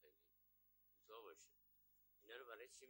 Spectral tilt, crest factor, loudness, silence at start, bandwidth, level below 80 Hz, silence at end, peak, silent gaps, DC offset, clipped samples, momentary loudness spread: -0.5 dB/octave; 22 dB; -61 LUFS; 0 s; 16 kHz; under -90 dBFS; 0 s; -44 dBFS; none; under 0.1%; under 0.1%; 6 LU